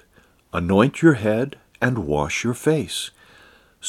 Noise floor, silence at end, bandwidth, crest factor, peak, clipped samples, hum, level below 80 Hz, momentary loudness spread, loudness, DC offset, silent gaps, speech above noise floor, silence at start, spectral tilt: -56 dBFS; 0 s; 14.5 kHz; 20 dB; -2 dBFS; under 0.1%; none; -46 dBFS; 12 LU; -21 LUFS; under 0.1%; none; 37 dB; 0.55 s; -5.5 dB/octave